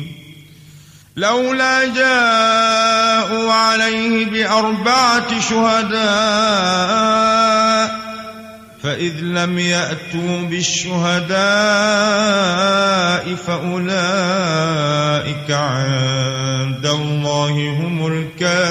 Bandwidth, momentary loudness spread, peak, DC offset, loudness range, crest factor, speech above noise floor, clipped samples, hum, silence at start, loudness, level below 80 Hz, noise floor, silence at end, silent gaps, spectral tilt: 13.5 kHz; 8 LU; -2 dBFS; under 0.1%; 4 LU; 14 dB; 26 dB; under 0.1%; none; 0 s; -15 LUFS; -52 dBFS; -42 dBFS; 0 s; none; -4 dB/octave